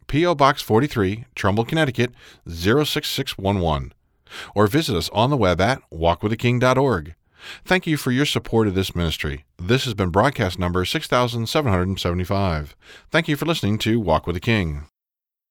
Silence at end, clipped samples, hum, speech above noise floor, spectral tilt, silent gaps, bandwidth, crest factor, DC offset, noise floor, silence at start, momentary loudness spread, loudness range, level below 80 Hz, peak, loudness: 0.65 s; under 0.1%; none; 68 dB; -5.5 dB/octave; none; 19.5 kHz; 20 dB; under 0.1%; -88 dBFS; 0.1 s; 9 LU; 2 LU; -42 dBFS; -2 dBFS; -21 LUFS